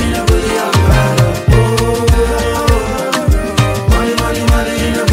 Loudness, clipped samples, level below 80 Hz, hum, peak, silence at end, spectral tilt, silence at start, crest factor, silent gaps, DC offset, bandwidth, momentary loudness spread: -13 LUFS; under 0.1%; -18 dBFS; none; 0 dBFS; 0 s; -5.5 dB/octave; 0 s; 10 dB; none; under 0.1%; 16.5 kHz; 3 LU